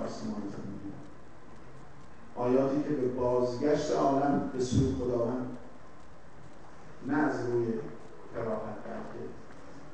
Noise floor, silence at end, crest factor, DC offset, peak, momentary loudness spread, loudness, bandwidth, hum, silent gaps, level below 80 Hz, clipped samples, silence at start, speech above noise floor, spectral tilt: -53 dBFS; 0 s; 18 dB; 0.8%; -14 dBFS; 24 LU; -31 LUFS; 9.2 kHz; none; none; -54 dBFS; under 0.1%; 0 s; 24 dB; -7 dB/octave